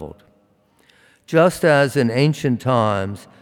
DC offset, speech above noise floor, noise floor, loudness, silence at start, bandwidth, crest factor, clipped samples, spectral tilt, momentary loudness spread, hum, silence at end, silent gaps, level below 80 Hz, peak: under 0.1%; 41 dB; -59 dBFS; -18 LUFS; 0 s; 17.5 kHz; 16 dB; under 0.1%; -6.5 dB/octave; 9 LU; none; 0.2 s; none; -56 dBFS; -4 dBFS